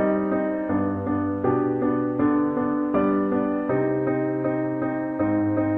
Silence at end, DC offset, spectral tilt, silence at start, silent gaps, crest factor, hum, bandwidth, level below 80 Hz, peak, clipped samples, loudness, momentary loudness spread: 0 s; under 0.1%; -11.5 dB/octave; 0 s; none; 14 dB; none; 3.4 kHz; -56 dBFS; -8 dBFS; under 0.1%; -24 LUFS; 3 LU